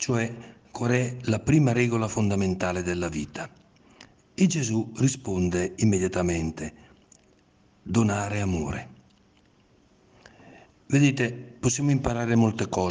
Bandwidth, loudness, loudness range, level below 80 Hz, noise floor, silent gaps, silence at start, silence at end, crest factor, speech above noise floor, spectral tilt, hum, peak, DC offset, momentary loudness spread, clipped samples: 10 kHz; -26 LUFS; 5 LU; -52 dBFS; -61 dBFS; none; 0 s; 0 s; 20 dB; 36 dB; -6 dB/octave; none; -6 dBFS; under 0.1%; 14 LU; under 0.1%